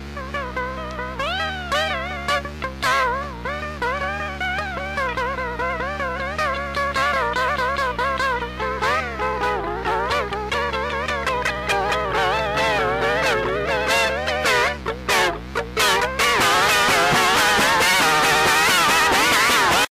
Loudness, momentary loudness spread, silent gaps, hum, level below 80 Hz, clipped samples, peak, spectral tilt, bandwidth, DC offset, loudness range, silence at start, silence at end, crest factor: -20 LUFS; 10 LU; none; none; -38 dBFS; under 0.1%; -8 dBFS; -2.5 dB/octave; 16 kHz; under 0.1%; 8 LU; 0 s; 0 s; 12 dB